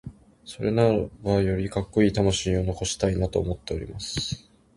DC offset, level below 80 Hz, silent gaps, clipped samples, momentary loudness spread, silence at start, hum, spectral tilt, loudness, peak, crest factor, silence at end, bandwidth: under 0.1%; -40 dBFS; none; under 0.1%; 11 LU; 0.05 s; none; -5.5 dB/octave; -25 LUFS; -6 dBFS; 20 dB; 0.4 s; 11.5 kHz